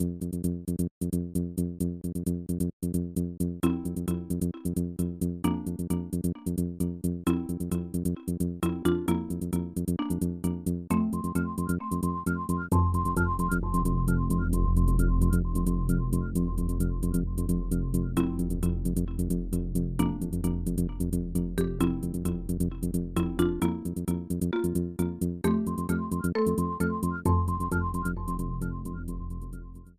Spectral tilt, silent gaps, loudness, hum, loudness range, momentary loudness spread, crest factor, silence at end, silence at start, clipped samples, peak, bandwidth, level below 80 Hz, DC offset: -7.5 dB/octave; 0.91-1.01 s, 2.73-2.80 s; -30 LUFS; none; 4 LU; 5 LU; 18 dB; 0.05 s; 0 s; under 0.1%; -10 dBFS; 15 kHz; -34 dBFS; 0.2%